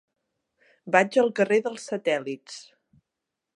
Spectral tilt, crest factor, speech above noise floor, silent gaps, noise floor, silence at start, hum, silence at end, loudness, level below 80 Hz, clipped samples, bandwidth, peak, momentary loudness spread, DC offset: -4.5 dB/octave; 24 dB; 61 dB; none; -85 dBFS; 0.85 s; none; 0.95 s; -24 LUFS; -80 dBFS; under 0.1%; 11.5 kHz; -2 dBFS; 17 LU; under 0.1%